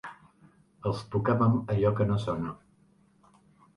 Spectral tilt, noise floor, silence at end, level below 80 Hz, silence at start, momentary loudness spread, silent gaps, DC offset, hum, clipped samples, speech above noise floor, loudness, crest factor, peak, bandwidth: -9 dB/octave; -63 dBFS; 1.2 s; -54 dBFS; 0.05 s; 13 LU; none; under 0.1%; none; under 0.1%; 36 dB; -28 LUFS; 18 dB; -12 dBFS; 10.5 kHz